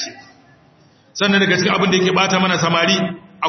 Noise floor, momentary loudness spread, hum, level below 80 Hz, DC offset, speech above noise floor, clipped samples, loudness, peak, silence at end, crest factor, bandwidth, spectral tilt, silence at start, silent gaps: -51 dBFS; 10 LU; none; -58 dBFS; under 0.1%; 36 dB; under 0.1%; -15 LUFS; 0 dBFS; 0 s; 16 dB; 6.4 kHz; -4 dB/octave; 0 s; none